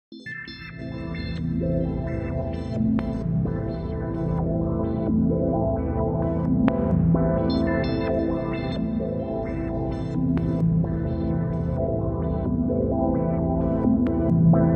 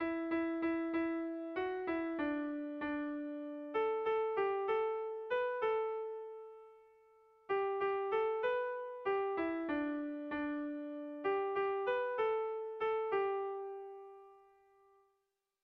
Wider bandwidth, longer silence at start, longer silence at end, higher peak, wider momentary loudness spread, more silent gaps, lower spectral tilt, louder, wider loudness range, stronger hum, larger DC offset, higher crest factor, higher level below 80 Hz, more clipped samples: about the same, 5.6 kHz vs 5.4 kHz; about the same, 0.1 s vs 0 s; second, 0 s vs 1.25 s; first, -8 dBFS vs -26 dBFS; about the same, 7 LU vs 9 LU; neither; first, -10.5 dB/octave vs -7 dB/octave; first, -24 LUFS vs -38 LUFS; about the same, 4 LU vs 2 LU; neither; neither; about the same, 16 dB vs 12 dB; first, -34 dBFS vs -74 dBFS; neither